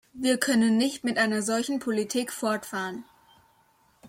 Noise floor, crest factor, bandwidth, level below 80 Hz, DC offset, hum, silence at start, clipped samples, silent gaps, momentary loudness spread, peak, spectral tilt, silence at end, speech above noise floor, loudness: -64 dBFS; 20 dB; 16.5 kHz; -70 dBFS; under 0.1%; none; 0.15 s; under 0.1%; none; 10 LU; -6 dBFS; -3.5 dB/octave; 0 s; 38 dB; -26 LUFS